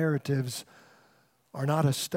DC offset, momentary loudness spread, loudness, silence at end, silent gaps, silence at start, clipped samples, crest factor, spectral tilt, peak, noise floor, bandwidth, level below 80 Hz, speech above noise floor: under 0.1%; 13 LU; -30 LUFS; 0 s; none; 0 s; under 0.1%; 18 dB; -5.5 dB/octave; -12 dBFS; -65 dBFS; 16.5 kHz; -74 dBFS; 37 dB